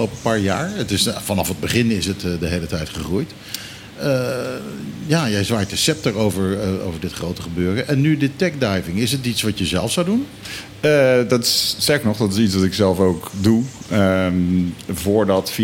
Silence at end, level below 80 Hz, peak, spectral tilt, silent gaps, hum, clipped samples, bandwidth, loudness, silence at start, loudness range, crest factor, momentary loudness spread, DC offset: 0 s; -44 dBFS; -4 dBFS; -5 dB/octave; none; none; under 0.1%; 17 kHz; -19 LUFS; 0 s; 5 LU; 16 dB; 10 LU; under 0.1%